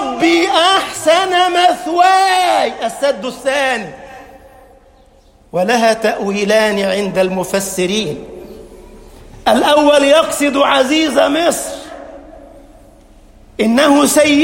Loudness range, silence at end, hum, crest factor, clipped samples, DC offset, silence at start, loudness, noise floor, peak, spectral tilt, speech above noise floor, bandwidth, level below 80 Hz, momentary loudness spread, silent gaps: 5 LU; 0 s; none; 14 dB; under 0.1%; under 0.1%; 0 s; -13 LUFS; -47 dBFS; 0 dBFS; -3 dB/octave; 34 dB; 16.5 kHz; -46 dBFS; 13 LU; none